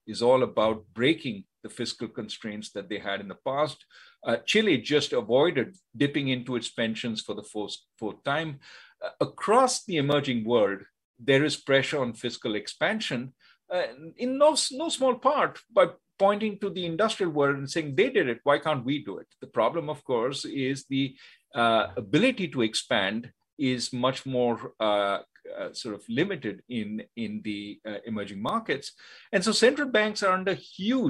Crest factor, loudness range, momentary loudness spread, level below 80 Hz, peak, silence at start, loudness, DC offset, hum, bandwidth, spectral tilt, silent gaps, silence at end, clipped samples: 20 dB; 6 LU; 13 LU; -70 dBFS; -6 dBFS; 0.05 s; -27 LUFS; under 0.1%; none; 12 kHz; -4.5 dB/octave; 11.05-11.14 s, 23.53-23.57 s; 0 s; under 0.1%